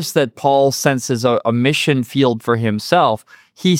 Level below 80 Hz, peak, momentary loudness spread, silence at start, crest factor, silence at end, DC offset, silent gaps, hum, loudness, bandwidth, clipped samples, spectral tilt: -62 dBFS; -2 dBFS; 4 LU; 0 s; 14 dB; 0 s; under 0.1%; none; none; -16 LUFS; 17 kHz; under 0.1%; -5 dB/octave